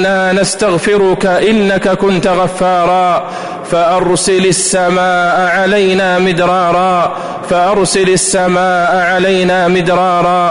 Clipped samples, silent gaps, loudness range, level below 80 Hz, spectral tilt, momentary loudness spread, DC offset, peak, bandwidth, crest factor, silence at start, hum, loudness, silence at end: under 0.1%; none; 1 LU; -40 dBFS; -4 dB/octave; 3 LU; 0.4%; -2 dBFS; 11 kHz; 8 dB; 0 s; none; -10 LUFS; 0 s